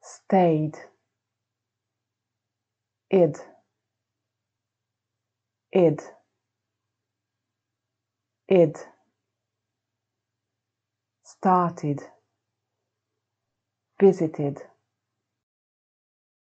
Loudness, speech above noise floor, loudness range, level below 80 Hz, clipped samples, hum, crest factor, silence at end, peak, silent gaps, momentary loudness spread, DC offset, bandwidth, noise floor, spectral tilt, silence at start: -23 LUFS; 64 dB; 3 LU; -82 dBFS; under 0.1%; none; 22 dB; 1.95 s; -6 dBFS; none; 13 LU; under 0.1%; 8.4 kHz; -85 dBFS; -8 dB/octave; 0.1 s